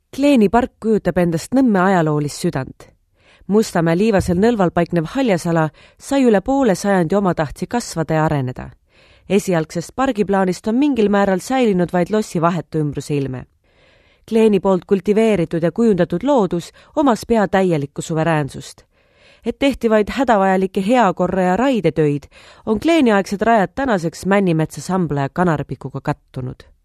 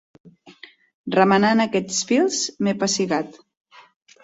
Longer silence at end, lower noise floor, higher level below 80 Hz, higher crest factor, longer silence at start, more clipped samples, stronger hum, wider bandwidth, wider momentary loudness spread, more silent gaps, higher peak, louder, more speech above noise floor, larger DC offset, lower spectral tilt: second, 0.3 s vs 0.9 s; first, -54 dBFS vs -47 dBFS; first, -44 dBFS vs -64 dBFS; about the same, 18 dB vs 20 dB; about the same, 0.15 s vs 0.25 s; neither; neither; first, 14 kHz vs 8 kHz; about the same, 10 LU vs 9 LU; second, none vs 0.94-1.04 s; about the same, 0 dBFS vs -2 dBFS; first, -17 LUFS vs -20 LUFS; first, 37 dB vs 28 dB; neither; first, -6.5 dB/octave vs -4 dB/octave